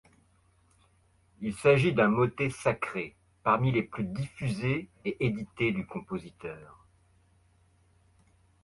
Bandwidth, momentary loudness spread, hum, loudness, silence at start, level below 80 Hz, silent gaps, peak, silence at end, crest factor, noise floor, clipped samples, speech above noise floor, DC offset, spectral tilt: 11.5 kHz; 15 LU; none; -29 LUFS; 1.4 s; -58 dBFS; none; -8 dBFS; 2 s; 22 dB; -66 dBFS; under 0.1%; 37 dB; under 0.1%; -7 dB/octave